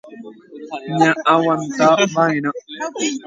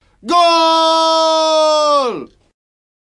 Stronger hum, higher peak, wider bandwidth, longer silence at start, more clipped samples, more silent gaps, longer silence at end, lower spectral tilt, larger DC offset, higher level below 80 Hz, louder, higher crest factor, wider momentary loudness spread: neither; about the same, 0 dBFS vs 0 dBFS; second, 9.4 kHz vs 11.5 kHz; second, 0.05 s vs 0.25 s; neither; neither; second, 0 s vs 0.75 s; first, -4.5 dB/octave vs -1.5 dB/octave; neither; second, -66 dBFS vs -60 dBFS; second, -17 LUFS vs -12 LUFS; about the same, 18 dB vs 14 dB; first, 19 LU vs 6 LU